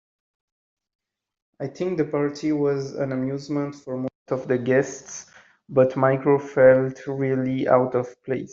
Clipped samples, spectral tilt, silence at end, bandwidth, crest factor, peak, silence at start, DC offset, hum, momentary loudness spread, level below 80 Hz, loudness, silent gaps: under 0.1%; -7 dB/octave; 0 s; 7.6 kHz; 20 dB; -4 dBFS; 1.6 s; under 0.1%; none; 13 LU; -64 dBFS; -23 LUFS; 4.15-4.26 s